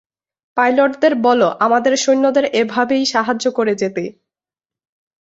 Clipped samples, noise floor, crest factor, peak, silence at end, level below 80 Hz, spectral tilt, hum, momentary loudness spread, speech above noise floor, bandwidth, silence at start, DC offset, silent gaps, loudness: under 0.1%; under -90 dBFS; 14 dB; -2 dBFS; 1.1 s; -64 dBFS; -3.5 dB/octave; none; 7 LU; over 75 dB; 8 kHz; 0.55 s; under 0.1%; none; -15 LUFS